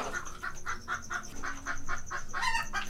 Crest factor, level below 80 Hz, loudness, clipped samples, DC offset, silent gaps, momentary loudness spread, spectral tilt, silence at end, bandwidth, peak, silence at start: 16 dB; -42 dBFS; -36 LUFS; under 0.1%; under 0.1%; none; 8 LU; -2 dB/octave; 0 s; 14 kHz; -16 dBFS; 0 s